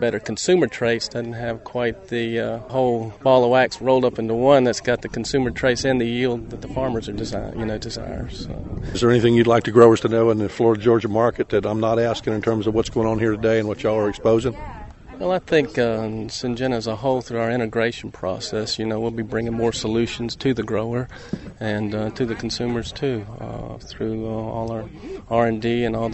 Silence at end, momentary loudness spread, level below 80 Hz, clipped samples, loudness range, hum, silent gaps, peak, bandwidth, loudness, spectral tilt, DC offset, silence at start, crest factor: 0 s; 13 LU; -42 dBFS; under 0.1%; 8 LU; none; none; 0 dBFS; 8.4 kHz; -21 LUFS; -6 dB/octave; under 0.1%; 0 s; 20 dB